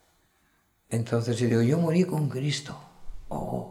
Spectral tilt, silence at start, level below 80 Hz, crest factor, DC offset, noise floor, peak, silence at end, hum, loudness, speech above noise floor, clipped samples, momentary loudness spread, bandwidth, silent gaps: -6.5 dB/octave; 0.9 s; -52 dBFS; 16 dB; under 0.1%; -68 dBFS; -12 dBFS; 0 s; none; -27 LUFS; 42 dB; under 0.1%; 14 LU; 13.5 kHz; none